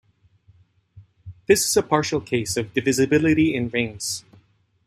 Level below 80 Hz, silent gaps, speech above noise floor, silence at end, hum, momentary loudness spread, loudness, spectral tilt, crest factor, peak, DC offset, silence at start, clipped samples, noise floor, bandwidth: -56 dBFS; none; 38 dB; 0.65 s; none; 10 LU; -21 LUFS; -4 dB/octave; 22 dB; -2 dBFS; under 0.1%; 0.95 s; under 0.1%; -58 dBFS; 15 kHz